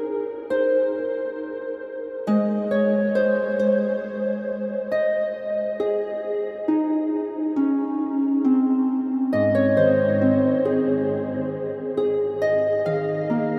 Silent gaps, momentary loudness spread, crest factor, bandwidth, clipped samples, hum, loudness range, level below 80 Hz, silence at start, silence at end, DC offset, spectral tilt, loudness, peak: none; 9 LU; 16 dB; 6 kHz; under 0.1%; none; 4 LU; -68 dBFS; 0 s; 0 s; under 0.1%; -9.5 dB/octave; -23 LUFS; -6 dBFS